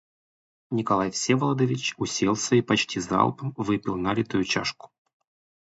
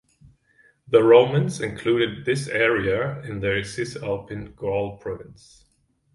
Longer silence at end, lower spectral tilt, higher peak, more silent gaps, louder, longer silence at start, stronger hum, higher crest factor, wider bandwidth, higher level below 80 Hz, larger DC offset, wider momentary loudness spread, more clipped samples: about the same, 0.75 s vs 0.8 s; second, -4.5 dB/octave vs -6 dB/octave; second, -6 dBFS vs -2 dBFS; neither; second, -25 LUFS vs -22 LUFS; second, 0.7 s vs 0.9 s; neither; about the same, 20 dB vs 22 dB; second, 8 kHz vs 11.5 kHz; second, -58 dBFS vs -52 dBFS; neither; second, 5 LU vs 15 LU; neither